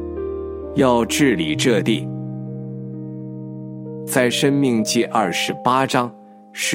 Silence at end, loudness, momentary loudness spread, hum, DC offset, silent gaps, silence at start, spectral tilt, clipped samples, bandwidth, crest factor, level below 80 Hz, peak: 0 s; -19 LUFS; 15 LU; none; under 0.1%; none; 0 s; -4.5 dB/octave; under 0.1%; 16.5 kHz; 20 dB; -46 dBFS; 0 dBFS